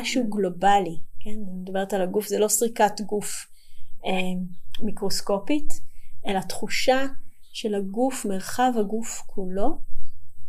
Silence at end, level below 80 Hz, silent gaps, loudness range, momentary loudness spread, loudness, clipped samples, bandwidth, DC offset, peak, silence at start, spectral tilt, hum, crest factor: 0 s; -38 dBFS; none; 5 LU; 15 LU; -26 LUFS; under 0.1%; 15.5 kHz; under 0.1%; -6 dBFS; 0 s; -4 dB/octave; none; 14 dB